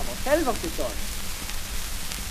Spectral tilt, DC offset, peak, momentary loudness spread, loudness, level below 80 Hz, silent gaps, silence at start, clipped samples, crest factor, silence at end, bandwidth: -3 dB/octave; under 0.1%; -6 dBFS; 8 LU; -29 LUFS; -34 dBFS; none; 0 s; under 0.1%; 20 dB; 0 s; 15 kHz